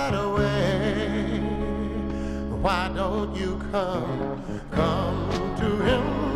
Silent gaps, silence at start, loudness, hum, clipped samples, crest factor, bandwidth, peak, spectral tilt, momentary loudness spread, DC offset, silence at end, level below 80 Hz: none; 0 s; -26 LUFS; none; under 0.1%; 18 dB; 13.5 kHz; -8 dBFS; -6.5 dB/octave; 7 LU; under 0.1%; 0 s; -36 dBFS